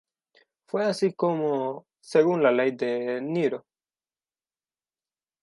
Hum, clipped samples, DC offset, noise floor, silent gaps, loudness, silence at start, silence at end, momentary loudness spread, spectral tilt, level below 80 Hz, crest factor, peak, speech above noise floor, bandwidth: none; under 0.1%; under 0.1%; under -90 dBFS; none; -25 LUFS; 0.75 s; 1.85 s; 11 LU; -6.5 dB/octave; -82 dBFS; 20 dB; -8 dBFS; over 66 dB; 11.5 kHz